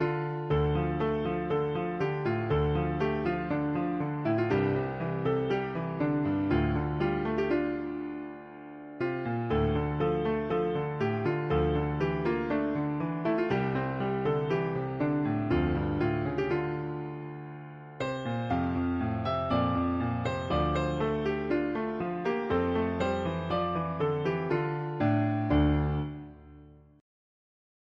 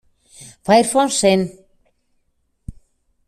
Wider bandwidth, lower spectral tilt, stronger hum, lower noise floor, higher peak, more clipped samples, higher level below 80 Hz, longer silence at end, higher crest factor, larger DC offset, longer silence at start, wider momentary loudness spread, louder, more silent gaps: second, 7.4 kHz vs 14.5 kHz; first, -8.5 dB/octave vs -4 dB/octave; neither; second, -53 dBFS vs -66 dBFS; second, -14 dBFS vs -2 dBFS; neither; about the same, -44 dBFS vs -48 dBFS; first, 1.25 s vs 0.55 s; about the same, 16 dB vs 18 dB; neither; second, 0 s vs 0.4 s; second, 7 LU vs 14 LU; second, -30 LUFS vs -16 LUFS; neither